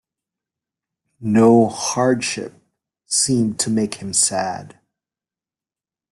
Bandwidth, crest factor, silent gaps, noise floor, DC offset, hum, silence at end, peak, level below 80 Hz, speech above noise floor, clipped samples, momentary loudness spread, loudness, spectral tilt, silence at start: 12.5 kHz; 18 dB; none; under -90 dBFS; under 0.1%; none; 1.45 s; -2 dBFS; -58 dBFS; over 72 dB; under 0.1%; 15 LU; -18 LUFS; -4 dB/octave; 1.2 s